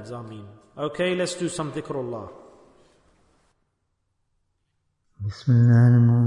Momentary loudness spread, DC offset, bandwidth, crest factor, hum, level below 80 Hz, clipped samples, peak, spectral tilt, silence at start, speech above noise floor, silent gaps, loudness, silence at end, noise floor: 24 LU; under 0.1%; 11 kHz; 16 dB; none; -62 dBFS; under 0.1%; -6 dBFS; -7.5 dB/octave; 0 s; 53 dB; none; -22 LUFS; 0 s; -74 dBFS